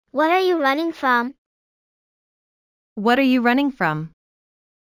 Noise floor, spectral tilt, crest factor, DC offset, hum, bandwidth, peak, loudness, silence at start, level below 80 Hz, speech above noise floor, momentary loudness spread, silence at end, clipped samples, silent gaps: under -90 dBFS; -6 dB/octave; 18 dB; under 0.1%; none; 20 kHz; -4 dBFS; -19 LUFS; 0.15 s; -64 dBFS; over 71 dB; 13 LU; 0.8 s; under 0.1%; 1.38-2.96 s